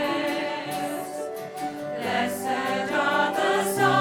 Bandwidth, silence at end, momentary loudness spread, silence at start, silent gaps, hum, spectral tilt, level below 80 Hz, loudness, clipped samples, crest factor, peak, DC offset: 19 kHz; 0 s; 10 LU; 0 s; none; none; -4 dB/octave; -70 dBFS; -26 LUFS; under 0.1%; 16 dB; -10 dBFS; under 0.1%